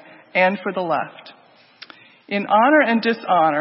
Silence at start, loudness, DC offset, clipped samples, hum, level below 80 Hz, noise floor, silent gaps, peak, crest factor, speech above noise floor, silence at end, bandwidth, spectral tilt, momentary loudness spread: 0.35 s; -18 LUFS; under 0.1%; under 0.1%; none; -76 dBFS; -46 dBFS; none; -4 dBFS; 16 dB; 28 dB; 0 s; 5.8 kHz; -9.5 dB/octave; 11 LU